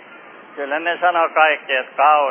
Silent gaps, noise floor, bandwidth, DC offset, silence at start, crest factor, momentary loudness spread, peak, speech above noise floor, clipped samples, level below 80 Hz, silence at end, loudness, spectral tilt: none; -41 dBFS; 3.5 kHz; under 0.1%; 0.1 s; 18 dB; 11 LU; 0 dBFS; 24 dB; under 0.1%; under -90 dBFS; 0 s; -17 LUFS; -5 dB/octave